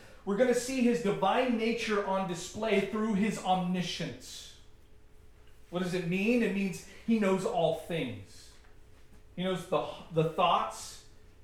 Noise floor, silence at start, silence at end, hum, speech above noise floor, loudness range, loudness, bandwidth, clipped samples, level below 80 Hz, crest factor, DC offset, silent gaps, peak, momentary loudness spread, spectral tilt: -54 dBFS; 0 s; 0.25 s; none; 24 dB; 5 LU; -31 LUFS; 15.5 kHz; under 0.1%; -58 dBFS; 18 dB; under 0.1%; none; -14 dBFS; 12 LU; -5.5 dB/octave